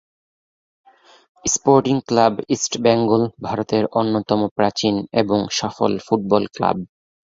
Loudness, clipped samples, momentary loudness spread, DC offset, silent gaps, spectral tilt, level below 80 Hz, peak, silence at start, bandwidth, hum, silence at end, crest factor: -19 LUFS; under 0.1%; 6 LU; under 0.1%; 4.51-4.56 s; -4.5 dB/octave; -54 dBFS; -2 dBFS; 1.45 s; 7.8 kHz; none; 0.55 s; 18 dB